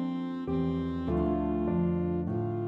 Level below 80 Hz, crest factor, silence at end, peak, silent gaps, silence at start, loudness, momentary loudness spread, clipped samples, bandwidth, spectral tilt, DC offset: -44 dBFS; 14 dB; 0 s; -16 dBFS; none; 0 s; -30 LUFS; 4 LU; under 0.1%; 5 kHz; -10.5 dB/octave; under 0.1%